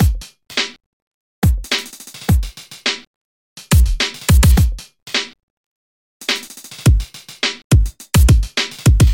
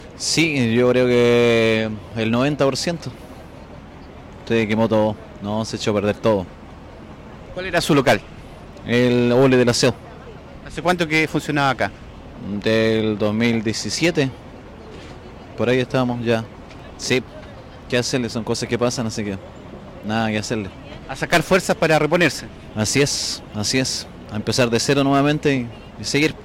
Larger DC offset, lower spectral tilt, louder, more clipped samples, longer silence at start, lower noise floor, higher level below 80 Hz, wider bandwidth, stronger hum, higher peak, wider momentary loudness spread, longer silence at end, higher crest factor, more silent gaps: neither; about the same, -4.5 dB/octave vs -4.5 dB/octave; about the same, -17 LUFS vs -19 LUFS; neither; about the same, 0 s vs 0 s; second, -33 dBFS vs -39 dBFS; first, -20 dBFS vs -46 dBFS; about the same, 17 kHz vs 16.5 kHz; neither; first, -2 dBFS vs -6 dBFS; second, 14 LU vs 23 LU; about the same, 0 s vs 0 s; about the same, 14 dB vs 14 dB; first, 0.86-1.42 s, 3.07-3.56 s, 5.43-6.20 s, 7.64-7.70 s vs none